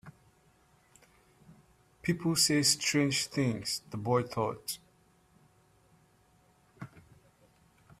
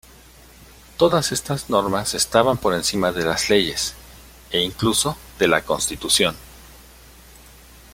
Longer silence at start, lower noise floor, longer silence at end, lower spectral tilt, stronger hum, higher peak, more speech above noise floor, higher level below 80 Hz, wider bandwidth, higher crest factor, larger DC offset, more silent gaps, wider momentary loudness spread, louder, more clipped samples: second, 0.05 s vs 0.6 s; first, -66 dBFS vs -47 dBFS; about the same, 1.15 s vs 1.15 s; about the same, -3.5 dB/octave vs -3 dB/octave; neither; second, -12 dBFS vs -2 dBFS; first, 36 dB vs 27 dB; second, -68 dBFS vs -46 dBFS; about the same, 15.5 kHz vs 16.5 kHz; about the same, 22 dB vs 20 dB; neither; neither; first, 22 LU vs 7 LU; second, -30 LUFS vs -20 LUFS; neither